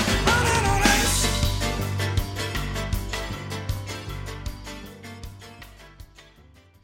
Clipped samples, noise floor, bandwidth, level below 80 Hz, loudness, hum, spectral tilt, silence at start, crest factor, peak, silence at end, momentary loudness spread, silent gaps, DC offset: under 0.1%; -53 dBFS; 17 kHz; -32 dBFS; -24 LUFS; none; -3.5 dB/octave; 0 s; 22 dB; -4 dBFS; 0.6 s; 21 LU; none; under 0.1%